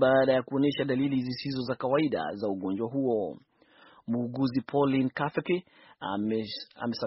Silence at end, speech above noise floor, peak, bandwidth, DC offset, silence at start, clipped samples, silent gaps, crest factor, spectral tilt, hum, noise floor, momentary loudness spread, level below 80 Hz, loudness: 0 s; 30 dB; -10 dBFS; 6 kHz; under 0.1%; 0 s; under 0.1%; none; 18 dB; -5 dB/octave; none; -58 dBFS; 9 LU; -68 dBFS; -29 LUFS